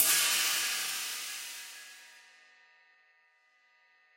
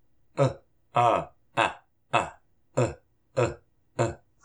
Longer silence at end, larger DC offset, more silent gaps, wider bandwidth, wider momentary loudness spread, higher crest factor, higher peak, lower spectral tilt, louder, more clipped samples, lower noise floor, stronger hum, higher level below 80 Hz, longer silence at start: first, 2 s vs 0.3 s; neither; neither; first, 16.5 kHz vs 10.5 kHz; first, 23 LU vs 16 LU; about the same, 26 dB vs 22 dB; second, -10 dBFS vs -6 dBFS; second, 3 dB/octave vs -5.5 dB/octave; about the same, -30 LUFS vs -28 LUFS; neither; first, -68 dBFS vs -51 dBFS; neither; second, -90 dBFS vs -56 dBFS; second, 0 s vs 0.35 s